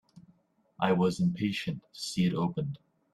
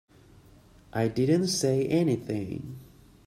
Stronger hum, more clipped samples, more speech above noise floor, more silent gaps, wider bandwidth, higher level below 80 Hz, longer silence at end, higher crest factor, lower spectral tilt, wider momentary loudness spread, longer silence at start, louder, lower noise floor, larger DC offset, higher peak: neither; neither; first, 37 dB vs 29 dB; neither; second, 12.5 kHz vs 15.5 kHz; second, -64 dBFS vs -58 dBFS; about the same, 0.4 s vs 0.4 s; about the same, 20 dB vs 16 dB; about the same, -6 dB/octave vs -5.5 dB/octave; second, 11 LU vs 14 LU; second, 0.15 s vs 0.95 s; second, -31 LUFS vs -27 LUFS; first, -66 dBFS vs -55 dBFS; neither; about the same, -12 dBFS vs -12 dBFS